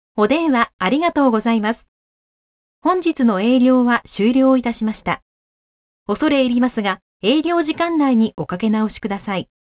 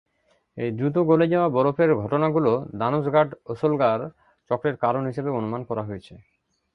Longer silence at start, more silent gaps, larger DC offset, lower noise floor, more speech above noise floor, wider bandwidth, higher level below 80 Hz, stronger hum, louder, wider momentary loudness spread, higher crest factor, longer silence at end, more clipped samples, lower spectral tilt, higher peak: second, 0.15 s vs 0.55 s; first, 0.73-0.79 s, 1.88-2.82 s, 5.22-6.06 s, 7.02-7.20 s vs none; neither; first, under -90 dBFS vs -67 dBFS; first, over 73 dB vs 44 dB; second, 4 kHz vs 5.8 kHz; first, -52 dBFS vs -60 dBFS; neither; first, -18 LUFS vs -23 LUFS; about the same, 9 LU vs 10 LU; about the same, 16 dB vs 18 dB; second, 0.2 s vs 0.6 s; neither; about the same, -10 dB/octave vs -9.5 dB/octave; first, -2 dBFS vs -6 dBFS